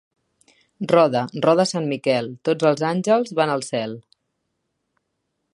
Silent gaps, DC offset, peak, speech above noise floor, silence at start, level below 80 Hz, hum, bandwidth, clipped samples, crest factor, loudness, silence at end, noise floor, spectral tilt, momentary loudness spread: none; under 0.1%; -2 dBFS; 56 dB; 0.8 s; -70 dBFS; none; 11.5 kHz; under 0.1%; 20 dB; -20 LUFS; 1.55 s; -75 dBFS; -5.5 dB/octave; 10 LU